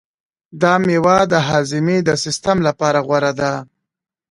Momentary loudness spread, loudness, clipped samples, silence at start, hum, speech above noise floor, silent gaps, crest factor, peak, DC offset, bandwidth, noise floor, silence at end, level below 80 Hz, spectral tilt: 5 LU; -16 LUFS; under 0.1%; 0.55 s; none; 66 dB; none; 16 dB; 0 dBFS; under 0.1%; 11.5 kHz; -81 dBFS; 0.65 s; -50 dBFS; -5 dB/octave